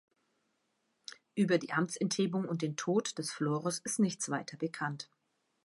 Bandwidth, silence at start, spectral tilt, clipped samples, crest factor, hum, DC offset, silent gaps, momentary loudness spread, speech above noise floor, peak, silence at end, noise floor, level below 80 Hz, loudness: 11.5 kHz; 1.35 s; -4.5 dB/octave; under 0.1%; 18 dB; none; under 0.1%; none; 14 LU; 46 dB; -16 dBFS; 0.6 s; -79 dBFS; -82 dBFS; -34 LUFS